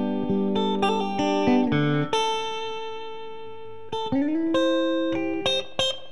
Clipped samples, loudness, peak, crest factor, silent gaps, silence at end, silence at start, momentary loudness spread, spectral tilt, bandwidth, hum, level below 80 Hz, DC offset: under 0.1%; -24 LUFS; -10 dBFS; 16 dB; none; 0 s; 0 s; 15 LU; -5.5 dB/octave; 11.5 kHz; none; -60 dBFS; 1%